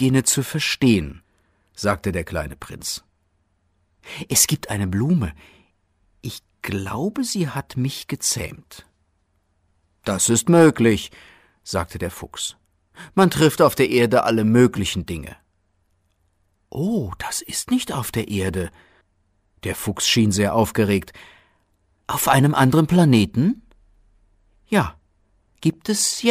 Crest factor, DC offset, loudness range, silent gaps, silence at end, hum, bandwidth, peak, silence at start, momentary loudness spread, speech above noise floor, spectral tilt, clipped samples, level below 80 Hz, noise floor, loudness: 20 dB; under 0.1%; 7 LU; none; 0 s; none; 16 kHz; -2 dBFS; 0 s; 17 LU; 47 dB; -4.5 dB/octave; under 0.1%; -46 dBFS; -66 dBFS; -20 LUFS